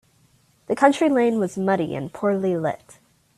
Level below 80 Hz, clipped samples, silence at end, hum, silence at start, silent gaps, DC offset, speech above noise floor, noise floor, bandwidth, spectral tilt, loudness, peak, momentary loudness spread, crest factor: -64 dBFS; under 0.1%; 0.6 s; none; 0.7 s; none; under 0.1%; 39 dB; -60 dBFS; 13.5 kHz; -6.5 dB/octave; -21 LUFS; -2 dBFS; 10 LU; 20 dB